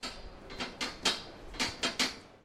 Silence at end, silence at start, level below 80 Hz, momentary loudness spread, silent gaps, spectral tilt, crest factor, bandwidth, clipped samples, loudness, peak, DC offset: 0.05 s; 0 s; -54 dBFS; 14 LU; none; -1.5 dB/octave; 24 dB; 16 kHz; under 0.1%; -34 LUFS; -14 dBFS; under 0.1%